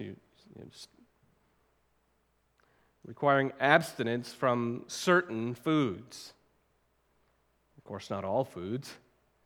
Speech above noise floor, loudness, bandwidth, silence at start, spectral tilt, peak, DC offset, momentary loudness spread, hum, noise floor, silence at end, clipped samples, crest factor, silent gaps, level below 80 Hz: 42 dB; -30 LUFS; 19 kHz; 0 s; -5.5 dB/octave; -6 dBFS; under 0.1%; 23 LU; none; -73 dBFS; 0.5 s; under 0.1%; 28 dB; none; -76 dBFS